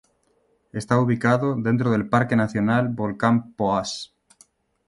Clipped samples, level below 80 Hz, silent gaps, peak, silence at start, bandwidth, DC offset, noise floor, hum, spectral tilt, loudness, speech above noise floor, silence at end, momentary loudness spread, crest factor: under 0.1%; -56 dBFS; none; -2 dBFS; 0.75 s; 11.5 kHz; under 0.1%; -65 dBFS; none; -7 dB/octave; -22 LUFS; 44 dB; 0.8 s; 12 LU; 20 dB